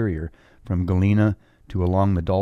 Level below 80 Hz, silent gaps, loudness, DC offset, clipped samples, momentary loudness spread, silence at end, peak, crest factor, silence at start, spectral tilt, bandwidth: -40 dBFS; none; -22 LUFS; under 0.1%; under 0.1%; 13 LU; 0 s; -6 dBFS; 16 dB; 0 s; -10 dB/octave; 6 kHz